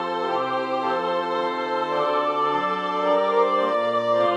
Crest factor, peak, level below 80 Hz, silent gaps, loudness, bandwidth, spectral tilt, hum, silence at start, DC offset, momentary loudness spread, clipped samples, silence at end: 14 dB; -8 dBFS; -76 dBFS; none; -23 LUFS; 9.4 kHz; -5.5 dB/octave; none; 0 s; under 0.1%; 5 LU; under 0.1%; 0 s